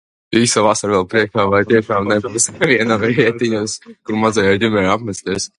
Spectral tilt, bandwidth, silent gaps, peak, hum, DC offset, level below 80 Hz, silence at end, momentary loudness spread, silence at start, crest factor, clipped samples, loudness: -4 dB/octave; 11.5 kHz; none; 0 dBFS; none; under 0.1%; -46 dBFS; 0.1 s; 7 LU; 0.3 s; 16 dB; under 0.1%; -15 LUFS